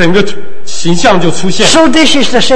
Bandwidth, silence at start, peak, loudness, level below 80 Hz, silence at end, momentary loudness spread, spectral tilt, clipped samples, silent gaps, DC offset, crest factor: 11 kHz; 0 s; 0 dBFS; -8 LUFS; -32 dBFS; 0 s; 11 LU; -3.5 dB/octave; 3%; none; 40%; 12 dB